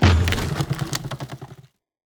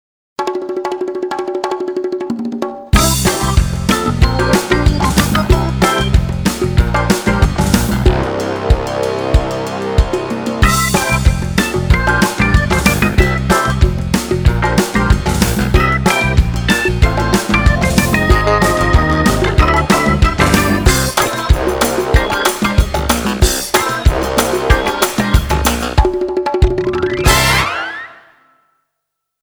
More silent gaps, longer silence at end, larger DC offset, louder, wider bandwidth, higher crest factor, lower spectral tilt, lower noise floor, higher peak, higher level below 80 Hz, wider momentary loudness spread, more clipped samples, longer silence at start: neither; second, 0.6 s vs 1.3 s; neither; second, -24 LUFS vs -14 LUFS; about the same, over 20 kHz vs over 20 kHz; first, 20 dB vs 14 dB; about the same, -5 dB/octave vs -5 dB/octave; second, -48 dBFS vs -75 dBFS; second, -4 dBFS vs 0 dBFS; second, -32 dBFS vs -18 dBFS; first, 18 LU vs 8 LU; second, under 0.1% vs 0.2%; second, 0 s vs 0.4 s